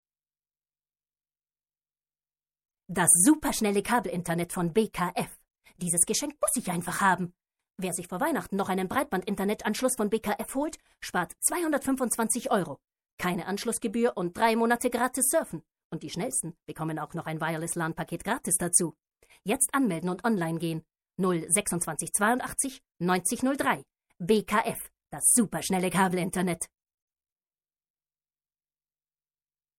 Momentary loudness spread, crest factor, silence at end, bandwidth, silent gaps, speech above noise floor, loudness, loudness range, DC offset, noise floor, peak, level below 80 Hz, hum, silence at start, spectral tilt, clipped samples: 11 LU; 22 dB; 3.15 s; 16.5 kHz; 13.13-13.18 s, 15.85-15.90 s; over 62 dB; -27 LUFS; 4 LU; under 0.1%; under -90 dBFS; -6 dBFS; -60 dBFS; none; 2.9 s; -3.5 dB/octave; under 0.1%